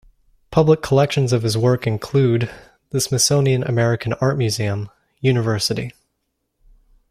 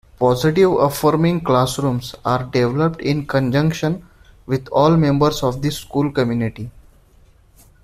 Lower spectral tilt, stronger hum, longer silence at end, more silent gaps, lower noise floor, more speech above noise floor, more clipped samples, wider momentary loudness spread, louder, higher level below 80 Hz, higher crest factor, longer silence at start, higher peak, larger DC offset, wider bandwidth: second, -5 dB/octave vs -6.5 dB/octave; neither; about the same, 1.2 s vs 1.15 s; neither; first, -73 dBFS vs -50 dBFS; first, 56 dB vs 33 dB; neither; about the same, 10 LU vs 9 LU; about the same, -19 LUFS vs -18 LUFS; second, -48 dBFS vs -42 dBFS; about the same, 16 dB vs 16 dB; first, 0.5 s vs 0.2 s; about the same, -2 dBFS vs -2 dBFS; neither; about the same, 15 kHz vs 15.5 kHz